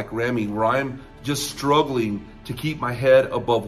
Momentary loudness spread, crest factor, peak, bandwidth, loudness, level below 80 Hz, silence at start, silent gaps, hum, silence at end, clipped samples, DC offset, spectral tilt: 14 LU; 18 dB; -4 dBFS; 14.5 kHz; -22 LUFS; -48 dBFS; 0 s; none; none; 0 s; under 0.1%; under 0.1%; -5 dB/octave